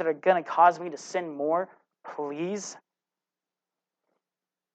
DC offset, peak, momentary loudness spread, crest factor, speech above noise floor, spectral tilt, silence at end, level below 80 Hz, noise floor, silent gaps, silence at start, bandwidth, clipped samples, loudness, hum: under 0.1%; -8 dBFS; 16 LU; 22 dB; over 63 dB; -4.5 dB/octave; 1.95 s; under -90 dBFS; under -90 dBFS; none; 0 s; 8.8 kHz; under 0.1%; -27 LUFS; none